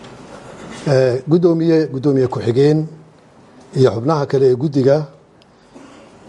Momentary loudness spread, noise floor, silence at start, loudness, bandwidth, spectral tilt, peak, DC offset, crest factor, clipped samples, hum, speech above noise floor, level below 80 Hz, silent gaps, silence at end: 19 LU; -48 dBFS; 0 s; -15 LUFS; 10.5 kHz; -8 dB/octave; -2 dBFS; under 0.1%; 16 dB; under 0.1%; none; 34 dB; -56 dBFS; none; 0.5 s